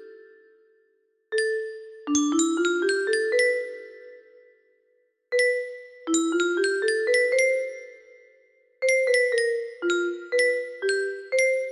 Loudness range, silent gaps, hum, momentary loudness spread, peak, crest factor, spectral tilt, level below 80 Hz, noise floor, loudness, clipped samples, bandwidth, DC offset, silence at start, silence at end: 3 LU; none; none; 14 LU; -10 dBFS; 16 dB; -1 dB/octave; -74 dBFS; -68 dBFS; -24 LUFS; under 0.1%; 12 kHz; under 0.1%; 0 s; 0 s